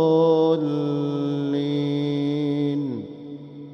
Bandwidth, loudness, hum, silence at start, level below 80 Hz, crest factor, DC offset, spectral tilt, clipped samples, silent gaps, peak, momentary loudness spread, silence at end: 6.4 kHz; -23 LUFS; none; 0 s; -68 dBFS; 14 dB; under 0.1%; -9 dB/octave; under 0.1%; none; -8 dBFS; 17 LU; 0 s